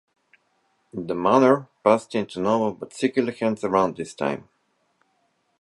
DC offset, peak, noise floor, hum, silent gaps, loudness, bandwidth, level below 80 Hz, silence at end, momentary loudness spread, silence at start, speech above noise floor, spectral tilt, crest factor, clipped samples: under 0.1%; -4 dBFS; -69 dBFS; none; none; -23 LUFS; 11.5 kHz; -64 dBFS; 1.2 s; 11 LU; 0.95 s; 47 dB; -6 dB/octave; 22 dB; under 0.1%